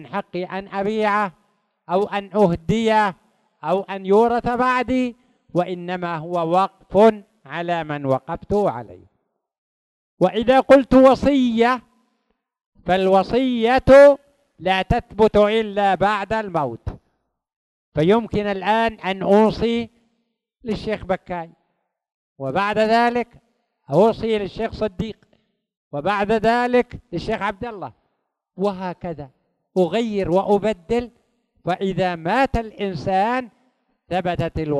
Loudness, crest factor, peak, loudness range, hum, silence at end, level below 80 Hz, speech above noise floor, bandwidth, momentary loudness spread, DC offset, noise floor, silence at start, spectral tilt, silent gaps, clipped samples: -19 LUFS; 18 dB; -2 dBFS; 7 LU; none; 0 s; -42 dBFS; 55 dB; 12 kHz; 14 LU; under 0.1%; -74 dBFS; 0 s; -7 dB/octave; 9.58-10.17 s, 12.66-12.72 s, 17.56-17.92 s, 22.14-22.36 s, 25.77-25.91 s; under 0.1%